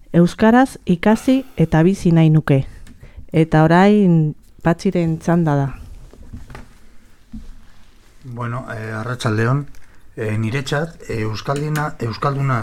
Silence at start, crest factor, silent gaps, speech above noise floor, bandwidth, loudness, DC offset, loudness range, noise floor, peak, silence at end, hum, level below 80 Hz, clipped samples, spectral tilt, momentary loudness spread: 0.1 s; 18 dB; none; 26 dB; 13.5 kHz; -17 LUFS; under 0.1%; 12 LU; -42 dBFS; 0 dBFS; 0 s; none; -40 dBFS; under 0.1%; -7.5 dB/octave; 13 LU